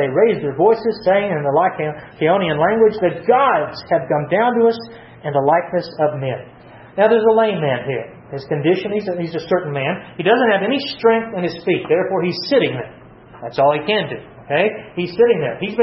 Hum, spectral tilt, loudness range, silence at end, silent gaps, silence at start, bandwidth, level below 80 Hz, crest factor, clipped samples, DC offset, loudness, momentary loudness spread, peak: none; -8.5 dB/octave; 3 LU; 0 s; none; 0 s; 6 kHz; -56 dBFS; 16 dB; under 0.1%; under 0.1%; -17 LUFS; 11 LU; -2 dBFS